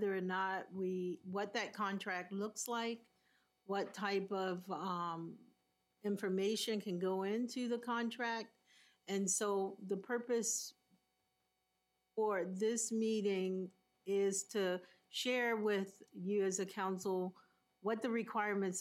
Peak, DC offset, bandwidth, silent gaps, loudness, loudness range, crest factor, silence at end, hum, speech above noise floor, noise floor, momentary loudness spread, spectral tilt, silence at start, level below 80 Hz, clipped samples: -24 dBFS; under 0.1%; 16 kHz; none; -39 LUFS; 3 LU; 16 dB; 0 s; none; 45 dB; -84 dBFS; 9 LU; -4 dB/octave; 0 s; under -90 dBFS; under 0.1%